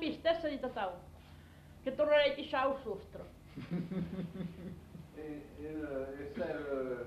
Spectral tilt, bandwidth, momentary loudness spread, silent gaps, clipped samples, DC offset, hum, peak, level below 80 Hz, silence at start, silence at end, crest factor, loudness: -6.5 dB/octave; 13.5 kHz; 21 LU; none; under 0.1%; under 0.1%; 50 Hz at -70 dBFS; -18 dBFS; -60 dBFS; 0 s; 0 s; 20 dB; -37 LUFS